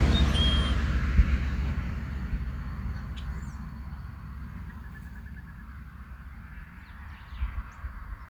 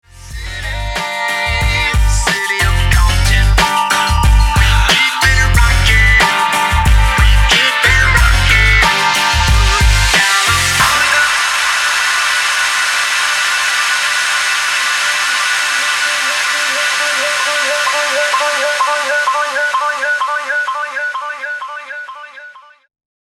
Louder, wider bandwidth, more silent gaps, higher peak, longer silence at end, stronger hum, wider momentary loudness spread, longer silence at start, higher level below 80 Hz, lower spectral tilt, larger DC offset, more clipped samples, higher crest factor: second, -31 LUFS vs -12 LUFS; second, 10 kHz vs 16.5 kHz; neither; second, -8 dBFS vs 0 dBFS; second, 0 s vs 0.8 s; neither; first, 20 LU vs 9 LU; second, 0 s vs 0.15 s; second, -32 dBFS vs -18 dBFS; first, -6 dB/octave vs -2 dB/octave; neither; neither; first, 22 dB vs 12 dB